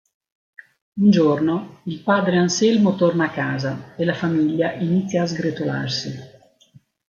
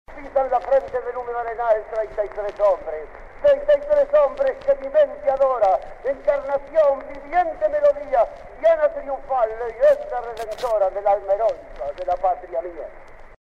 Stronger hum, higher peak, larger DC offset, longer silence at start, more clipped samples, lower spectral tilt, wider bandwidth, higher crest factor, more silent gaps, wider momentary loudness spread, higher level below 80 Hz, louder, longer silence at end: neither; first, -4 dBFS vs -8 dBFS; neither; first, 0.95 s vs 0.1 s; neither; about the same, -6 dB/octave vs -5 dB/octave; about the same, 7.2 kHz vs 7.6 kHz; about the same, 16 dB vs 14 dB; neither; about the same, 10 LU vs 11 LU; second, -62 dBFS vs -44 dBFS; about the same, -20 LUFS vs -21 LUFS; first, 0.8 s vs 0.05 s